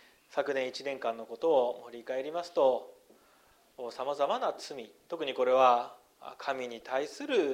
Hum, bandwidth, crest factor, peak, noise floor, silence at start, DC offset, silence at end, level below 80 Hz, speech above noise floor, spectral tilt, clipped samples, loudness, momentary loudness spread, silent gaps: none; 15 kHz; 22 dB; -10 dBFS; -64 dBFS; 0.3 s; under 0.1%; 0 s; -80 dBFS; 33 dB; -3.5 dB/octave; under 0.1%; -31 LUFS; 17 LU; none